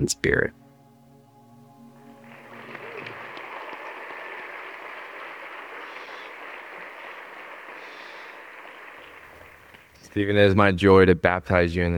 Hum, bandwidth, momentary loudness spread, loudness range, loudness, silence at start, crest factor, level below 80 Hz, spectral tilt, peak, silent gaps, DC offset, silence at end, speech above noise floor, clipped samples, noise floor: none; 17 kHz; 24 LU; 19 LU; -22 LUFS; 0 s; 24 dB; -50 dBFS; -5.5 dB/octave; -2 dBFS; none; under 0.1%; 0 s; 34 dB; under 0.1%; -53 dBFS